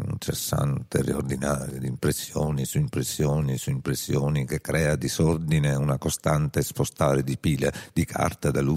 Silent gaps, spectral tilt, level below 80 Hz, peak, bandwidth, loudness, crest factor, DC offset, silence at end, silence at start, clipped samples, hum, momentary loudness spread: none; -5.5 dB/octave; -42 dBFS; -8 dBFS; 16 kHz; -26 LUFS; 18 dB; under 0.1%; 0 s; 0 s; under 0.1%; none; 4 LU